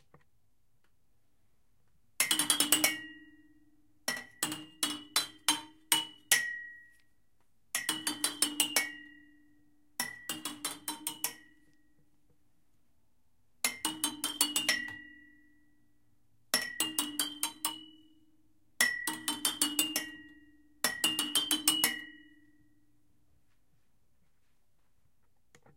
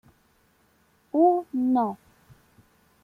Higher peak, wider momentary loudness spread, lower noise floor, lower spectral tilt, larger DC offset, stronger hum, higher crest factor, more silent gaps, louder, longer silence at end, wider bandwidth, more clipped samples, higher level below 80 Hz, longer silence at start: first, -6 dBFS vs -10 dBFS; first, 12 LU vs 9 LU; first, -77 dBFS vs -64 dBFS; second, 0.5 dB/octave vs -9 dB/octave; neither; neither; first, 30 dB vs 18 dB; neither; second, -31 LUFS vs -24 LUFS; first, 3.55 s vs 1.1 s; first, 17 kHz vs 4.6 kHz; neither; second, -76 dBFS vs -70 dBFS; first, 2.2 s vs 1.15 s